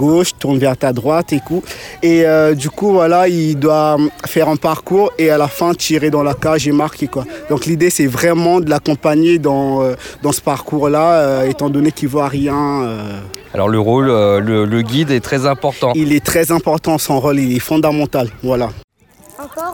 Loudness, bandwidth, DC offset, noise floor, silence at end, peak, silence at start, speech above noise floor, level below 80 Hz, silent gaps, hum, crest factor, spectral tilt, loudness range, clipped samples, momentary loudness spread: -14 LUFS; 19 kHz; under 0.1%; -43 dBFS; 0 s; -2 dBFS; 0 s; 30 dB; -44 dBFS; 18.84-18.88 s; none; 12 dB; -5.5 dB/octave; 2 LU; under 0.1%; 7 LU